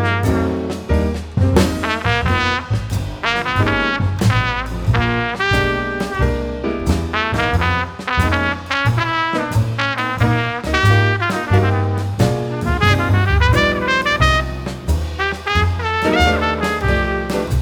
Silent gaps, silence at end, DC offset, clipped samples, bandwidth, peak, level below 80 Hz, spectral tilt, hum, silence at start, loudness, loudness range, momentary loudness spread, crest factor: none; 0 s; under 0.1%; under 0.1%; 19.5 kHz; -2 dBFS; -28 dBFS; -6 dB/octave; none; 0 s; -17 LUFS; 2 LU; 7 LU; 16 dB